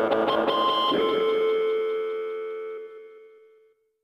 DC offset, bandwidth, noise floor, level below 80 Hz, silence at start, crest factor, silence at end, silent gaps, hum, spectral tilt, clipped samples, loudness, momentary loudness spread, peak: under 0.1%; 6 kHz; -61 dBFS; -66 dBFS; 0 s; 16 dB; 0.75 s; none; none; -5 dB/octave; under 0.1%; -25 LUFS; 15 LU; -10 dBFS